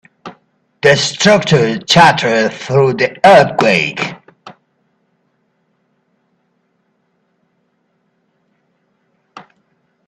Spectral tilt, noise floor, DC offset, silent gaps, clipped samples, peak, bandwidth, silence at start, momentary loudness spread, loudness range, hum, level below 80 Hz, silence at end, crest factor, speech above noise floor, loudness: -4.5 dB/octave; -63 dBFS; under 0.1%; none; under 0.1%; 0 dBFS; 13 kHz; 0.25 s; 8 LU; 10 LU; none; -52 dBFS; 0.65 s; 16 dB; 52 dB; -11 LUFS